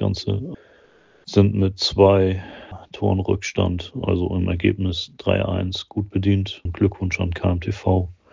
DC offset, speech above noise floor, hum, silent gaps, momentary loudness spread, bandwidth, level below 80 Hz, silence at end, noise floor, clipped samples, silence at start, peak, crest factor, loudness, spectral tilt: under 0.1%; 33 dB; none; none; 10 LU; 7.6 kHz; -34 dBFS; 0.2 s; -54 dBFS; under 0.1%; 0 s; -2 dBFS; 20 dB; -21 LUFS; -6.5 dB/octave